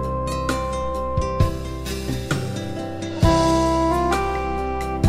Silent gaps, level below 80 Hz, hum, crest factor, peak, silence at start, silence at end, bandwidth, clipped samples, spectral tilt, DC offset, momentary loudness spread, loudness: none; -30 dBFS; none; 18 dB; -4 dBFS; 0 s; 0 s; 16 kHz; under 0.1%; -6 dB/octave; under 0.1%; 11 LU; -22 LUFS